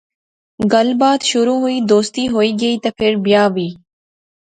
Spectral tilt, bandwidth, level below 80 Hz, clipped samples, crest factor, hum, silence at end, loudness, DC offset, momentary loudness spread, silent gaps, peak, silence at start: -4.5 dB/octave; 9.4 kHz; -54 dBFS; under 0.1%; 16 dB; none; 0.85 s; -15 LUFS; under 0.1%; 5 LU; none; 0 dBFS; 0.6 s